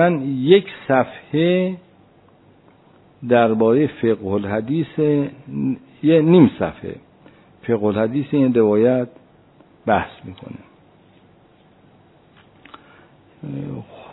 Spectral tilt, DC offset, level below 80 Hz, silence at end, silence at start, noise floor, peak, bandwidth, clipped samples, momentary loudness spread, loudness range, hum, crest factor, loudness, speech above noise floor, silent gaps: -11.5 dB/octave; under 0.1%; -58 dBFS; 0.1 s; 0 s; -52 dBFS; 0 dBFS; 4.1 kHz; under 0.1%; 20 LU; 11 LU; none; 20 dB; -18 LUFS; 35 dB; none